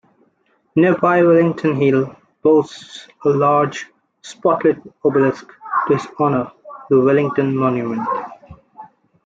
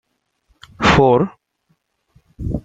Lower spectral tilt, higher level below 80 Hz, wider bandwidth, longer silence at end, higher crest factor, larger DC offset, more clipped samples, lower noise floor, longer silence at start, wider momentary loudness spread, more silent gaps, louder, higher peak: first, -7.5 dB/octave vs -6 dB/octave; second, -60 dBFS vs -36 dBFS; second, 7.8 kHz vs 9.2 kHz; first, 0.4 s vs 0.05 s; second, 14 dB vs 20 dB; neither; neither; second, -62 dBFS vs -66 dBFS; about the same, 0.75 s vs 0.8 s; about the same, 16 LU vs 15 LU; neither; about the same, -17 LUFS vs -15 LUFS; about the same, -2 dBFS vs 0 dBFS